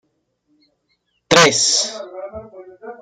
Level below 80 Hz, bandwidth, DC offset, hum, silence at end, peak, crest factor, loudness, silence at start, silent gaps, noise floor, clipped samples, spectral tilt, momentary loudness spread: -56 dBFS; 15.5 kHz; under 0.1%; none; 0.1 s; -2 dBFS; 20 dB; -13 LUFS; 1.3 s; none; -68 dBFS; under 0.1%; -1.5 dB/octave; 25 LU